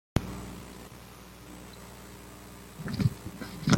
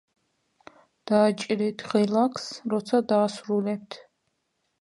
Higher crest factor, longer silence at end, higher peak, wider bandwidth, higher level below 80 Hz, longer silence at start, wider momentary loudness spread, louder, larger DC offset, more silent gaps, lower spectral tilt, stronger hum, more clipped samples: first, 28 dB vs 18 dB; second, 0 s vs 0.8 s; about the same, -6 dBFS vs -8 dBFS; first, 16.5 kHz vs 11.5 kHz; first, -48 dBFS vs -74 dBFS; second, 0.15 s vs 1.05 s; first, 17 LU vs 12 LU; second, -38 LUFS vs -25 LUFS; neither; neither; about the same, -5.5 dB/octave vs -6 dB/octave; first, 60 Hz at -50 dBFS vs none; neither